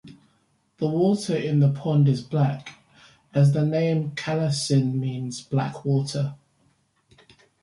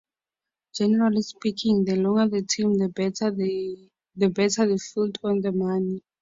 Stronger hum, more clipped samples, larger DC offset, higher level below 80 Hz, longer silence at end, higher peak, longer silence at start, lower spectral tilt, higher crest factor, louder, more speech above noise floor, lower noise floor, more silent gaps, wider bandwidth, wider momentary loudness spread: neither; neither; neither; about the same, -64 dBFS vs -64 dBFS; first, 1.25 s vs 0.25 s; about the same, -10 dBFS vs -8 dBFS; second, 0.05 s vs 0.75 s; first, -7 dB/octave vs -5.5 dB/octave; about the same, 16 dB vs 16 dB; about the same, -24 LUFS vs -24 LUFS; second, 44 dB vs 66 dB; second, -66 dBFS vs -89 dBFS; neither; first, 11.5 kHz vs 7.8 kHz; about the same, 9 LU vs 7 LU